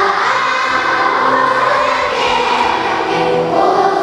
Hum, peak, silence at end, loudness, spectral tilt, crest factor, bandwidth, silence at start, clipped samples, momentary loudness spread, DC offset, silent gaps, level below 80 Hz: none; 0 dBFS; 0 s; -13 LUFS; -3.5 dB/octave; 12 dB; 12 kHz; 0 s; under 0.1%; 2 LU; under 0.1%; none; -48 dBFS